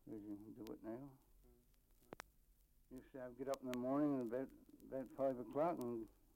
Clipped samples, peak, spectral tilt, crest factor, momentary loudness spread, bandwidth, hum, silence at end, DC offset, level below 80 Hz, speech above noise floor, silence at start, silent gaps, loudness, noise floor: under 0.1%; -26 dBFS; -7 dB/octave; 22 dB; 20 LU; 16.5 kHz; none; 0.25 s; under 0.1%; -74 dBFS; 29 dB; 0.05 s; none; -45 LUFS; -73 dBFS